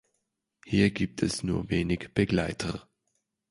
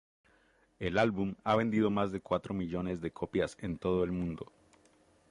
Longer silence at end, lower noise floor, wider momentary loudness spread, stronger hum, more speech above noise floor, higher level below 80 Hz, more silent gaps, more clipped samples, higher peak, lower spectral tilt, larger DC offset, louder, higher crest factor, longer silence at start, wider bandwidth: second, 0.7 s vs 0.85 s; first, -80 dBFS vs -68 dBFS; about the same, 8 LU vs 8 LU; neither; first, 53 dB vs 36 dB; first, -48 dBFS vs -56 dBFS; neither; neither; first, -10 dBFS vs -16 dBFS; about the same, -6 dB/octave vs -7 dB/octave; neither; first, -28 LUFS vs -33 LUFS; about the same, 20 dB vs 18 dB; second, 0.65 s vs 0.8 s; about the same, 11.5 kHz vs 11 kHz